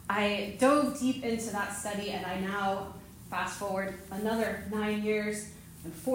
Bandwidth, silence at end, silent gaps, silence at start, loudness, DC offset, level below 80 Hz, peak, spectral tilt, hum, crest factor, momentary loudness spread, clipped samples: 16 kHz; 0 s; none; 0 s; -32 LUFS; under 0.1%; -60 dBFS; -14 dBFS; -4.5 dB/octave; none; 18 dB; 12 LU; under 0.1%